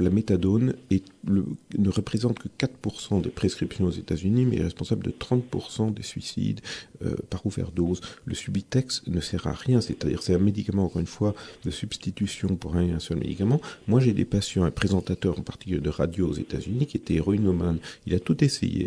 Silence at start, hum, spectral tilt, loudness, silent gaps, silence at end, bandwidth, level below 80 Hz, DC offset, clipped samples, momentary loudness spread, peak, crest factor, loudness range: 0 s; none; -6.5 dB/octave; -27 LUFS; none; 0 s; 11 kHz; -44 dBFS; under 0.1%; under 0.1%; 9 LU; -6 dBFS; 20 dB; 4 LU